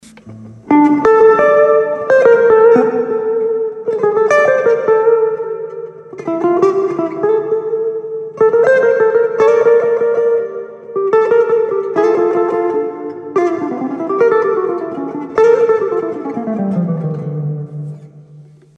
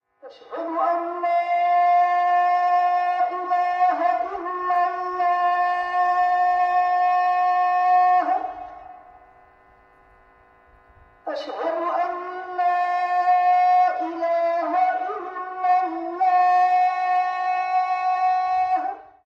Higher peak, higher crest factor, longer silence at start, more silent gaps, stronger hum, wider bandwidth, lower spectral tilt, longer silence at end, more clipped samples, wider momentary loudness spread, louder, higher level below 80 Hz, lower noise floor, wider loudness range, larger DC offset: first, 0 dBFS vs -10 dBFS; about the same, 12 dB vs 12 dB; about the same, 0.25 s vs 0.25 s; neither; neither; about the same, 6.8 kHz vs 6.4 kHz; first, -7.5 dB/octave vs -4 dB/octave; about the same, 0.35 s vs 0.25 s; neither; first, 13 LU vs 10 LU; first, -13 LUFS vs -21 LUFS; first, -58 dBFS vs -66 dBFS; second, -40 dBFS vs -54 dBFS; about the same, 6 LU vs 8 LU; neither